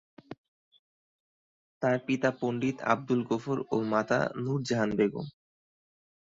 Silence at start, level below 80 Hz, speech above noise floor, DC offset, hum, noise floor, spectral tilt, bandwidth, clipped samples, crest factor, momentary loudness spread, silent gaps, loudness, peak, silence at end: 0.3 s; -68 dBFS; over 61 dB; under 0.1%; none; under -90 dBFS; -6.5 dB/octave; 7.8 kHz; under 0.1%; 22 dB; 16 LU; 0.38-0.71 s, 0.79-1.81 s; -30 LUFS; -8 dBFS; 1 s